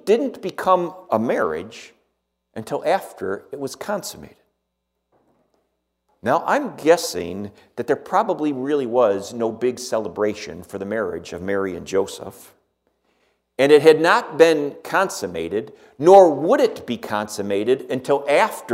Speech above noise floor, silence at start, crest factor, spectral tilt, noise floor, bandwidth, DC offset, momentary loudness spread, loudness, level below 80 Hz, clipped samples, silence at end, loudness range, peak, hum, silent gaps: 57 dB; 0.05 s; 20 dB; -4.5 dB/octave; -76 dBFS; 16 kHz; under 0.1%; 17 LU; -20 LUFS; -62 dBFS; under 0.1%; 0 s; 11 LU; 0 dBFS; none; none